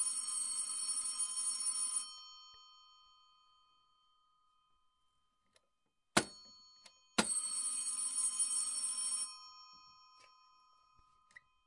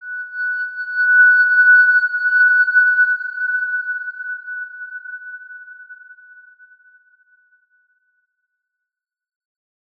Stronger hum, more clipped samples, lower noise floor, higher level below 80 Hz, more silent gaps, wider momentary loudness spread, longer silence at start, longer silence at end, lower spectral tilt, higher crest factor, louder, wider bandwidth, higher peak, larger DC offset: neither; neither; about the same, -85 dBFS vs -84 dBFS; first, -78 dBFS vs -88 dBFS; neither; about the same, 21 LU vs 22 LU; about the same, 0 s vs 0 s; second, 1.75 s vs 3.85 s; first, -0.5 dB/octave vs 2.5 dB/octave; first, 30 dB vs 14 dB; second, -35 LUFS vs -14 LUFS; first, 11.5 kHz vs 4.7 kHz; second, -12 dBFS vs -4 dBFS; neither